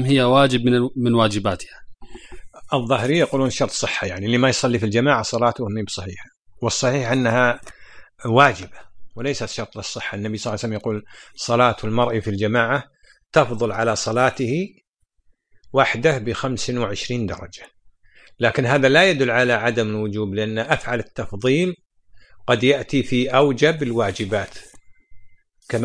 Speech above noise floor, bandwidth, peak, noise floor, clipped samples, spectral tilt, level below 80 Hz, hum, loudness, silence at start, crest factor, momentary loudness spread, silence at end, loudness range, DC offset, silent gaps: 40 dB; 10.5 kHz; 0 dBFS; -60 dBFS; under 0.1%; -5 dB/octave; -50 dBFS; none; -20 LUFS; 0 s; 20 dB; 13 LU; 0 s; 4 LU; under 0.1%; 6.39-6.45 s, 14.89-14.94 s, 21.86-21.90 s